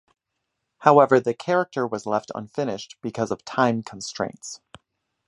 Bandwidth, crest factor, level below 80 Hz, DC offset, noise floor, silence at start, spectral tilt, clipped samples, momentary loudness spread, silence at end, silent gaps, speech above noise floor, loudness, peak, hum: 11.5 kHz; 24 dB; -66 dBFS; under 0.1%; -80 dBFS; 0.8 s; -5.5 dB/octave; under 0.1%; 17 LU; 0.7 s; none; 57 dB; -23 LUFS; 0 dBFS; none